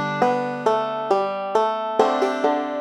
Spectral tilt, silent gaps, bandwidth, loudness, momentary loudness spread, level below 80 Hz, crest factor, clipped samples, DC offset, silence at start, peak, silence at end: -5.5 dB/octave; none; 12 kHz; -21 LUFS; 2 LU; -72 dBFS; 18 dB; under 0.1%; under 0.1%; 0 s; -4 dBFS; 0 s